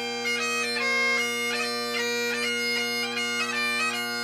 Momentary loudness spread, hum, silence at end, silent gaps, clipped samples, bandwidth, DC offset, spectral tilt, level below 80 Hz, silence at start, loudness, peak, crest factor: 4 LU; none; 0 s; none; under 0.1%; 15.5 kHz; under 0.1%; -0.5 dB/octave; -78 dBFS; 0 s; -25 LUFS; -16 dBFS; 12 dB